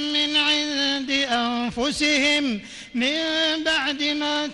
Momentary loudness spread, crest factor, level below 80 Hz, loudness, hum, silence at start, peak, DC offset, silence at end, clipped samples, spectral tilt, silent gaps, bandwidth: 6 LU; 14 dB; -54 dBFS; -21 LUFS; none; 0 s; -8 dBFS; under 0.1%; 0 s; under 0.1%; -2 dB/octave; none; 11.5 kHz